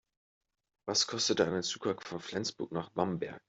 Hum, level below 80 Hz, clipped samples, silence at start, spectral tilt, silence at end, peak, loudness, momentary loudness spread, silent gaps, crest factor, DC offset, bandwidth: none; -72 dBFS; under 0.1%; 0.85 s; -3 dB/octave; 0.1 s; -14 dBFS; -33 LUFS; 10 LU; none; 22 dB; under 0.1%; 8.2 kHz